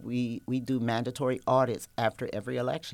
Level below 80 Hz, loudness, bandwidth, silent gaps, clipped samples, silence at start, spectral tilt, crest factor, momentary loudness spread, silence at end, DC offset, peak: -64 dBFS; -30 LUFS; 16.5 kHz; none; under 0.1%; 0 s; -6.5 dB/octave; 18 dB; 7 LU; 0 s; under 0.1%; -12 dBFS